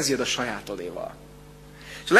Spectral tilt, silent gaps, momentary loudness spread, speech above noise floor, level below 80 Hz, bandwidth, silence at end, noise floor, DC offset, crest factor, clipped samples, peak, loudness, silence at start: -2.5 dB/octave; none; 23 LU; 18 dB; -54 dBFS; 13.5 kHz; 0 s; -46 dBFS; under 0.1%; 24 dB; under 0.1%; -2 dBFS; -29 LUFS; 0 s